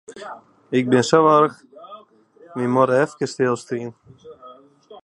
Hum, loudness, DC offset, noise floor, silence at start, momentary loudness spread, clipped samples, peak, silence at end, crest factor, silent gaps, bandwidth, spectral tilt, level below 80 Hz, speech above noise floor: none; -19 LUFS; under 0.1%; -50 dBFS; 0.1 s; 22 LU; under 0.1%; 0 dBFS; 0.05 s; 20 dB; none; 11.5 kHz; -5.5 dB/octave; -68 dBFS; 31 dB